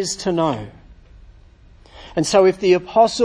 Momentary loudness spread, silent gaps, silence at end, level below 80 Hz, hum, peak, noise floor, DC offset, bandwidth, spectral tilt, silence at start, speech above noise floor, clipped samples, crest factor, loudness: 13 LU; none; 0 s; -46 dBFS; none; -2 dBFS; -47 dBFS; under 0.1%; 10.5 kHz; -4.5 dB/octave; 0 s; 30 dB; under 0.1%; 18 dB; -18 LUFS